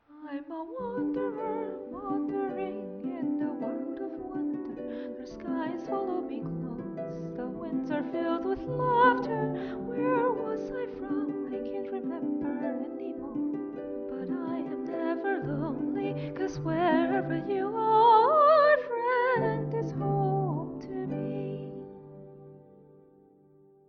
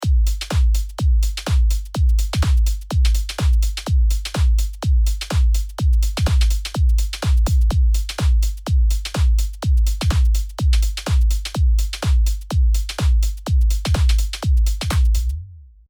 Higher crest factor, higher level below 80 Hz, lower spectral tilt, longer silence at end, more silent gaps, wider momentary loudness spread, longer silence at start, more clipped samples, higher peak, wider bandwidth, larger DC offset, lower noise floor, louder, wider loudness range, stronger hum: first, 20 dB vs 10 dB; second, -62 dBFS vs -18 dBFS; first, -8 dB/octave vs -5 dB/octave; first, 1.1 s vs 0.25 s; neither; first, 14 LU vs 3 LU; about the same, 0.1 s vs 0 s; neither; second, -10 dBFS vs -6 dBFS; second, 6.6 kHz vs 19 kHz; neither; first, -59 dBFS vs -38 dBFS; second, -30 LUFS vs -20 LUFS; first, 11 LU vs 1 LU; neither